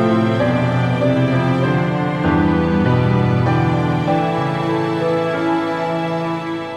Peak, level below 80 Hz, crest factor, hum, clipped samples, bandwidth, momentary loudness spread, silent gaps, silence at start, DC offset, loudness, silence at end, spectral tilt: -2 dBFS; -40 dBFS; 14 dB; none; under 0.1%; 9.4 kHz; 5 LU; none; 0 s; under 0.1%; -17 LUFS; 0 s; -8 dB/octave